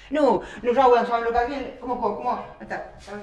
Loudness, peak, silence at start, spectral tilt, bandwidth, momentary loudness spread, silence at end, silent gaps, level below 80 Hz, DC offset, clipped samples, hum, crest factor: -23 LUFS; -6 dBFS; 0 s; -6 dB/octave; 9.6 kHz; 16 LU; 0 s; none; -48 dBFS; under 0.1%; under 0.1%; none; 18 dB